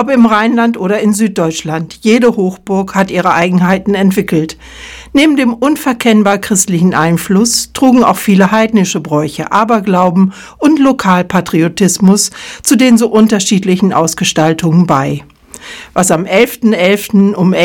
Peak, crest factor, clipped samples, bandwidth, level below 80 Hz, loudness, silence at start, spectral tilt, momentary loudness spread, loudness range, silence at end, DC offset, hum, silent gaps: 0 dBFS; 10 dB; 1%; 18 kHz; -44 dBFS; -10 LUFS; 0 s; -5 dB/octave; 7 LU; 2 LU; 0 s; under 0.1%; none; none